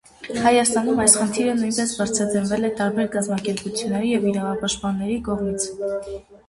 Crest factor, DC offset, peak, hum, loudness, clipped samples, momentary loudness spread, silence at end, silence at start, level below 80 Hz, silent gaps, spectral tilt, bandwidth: 22 dB; under 0.1%; 0 dBFS; none; -21 LUFS; under 0.1%; 9 LU; 0.1 s; 0.2 s; -50 dBFS; none; -3.5 dB/octave; 11.5 kHz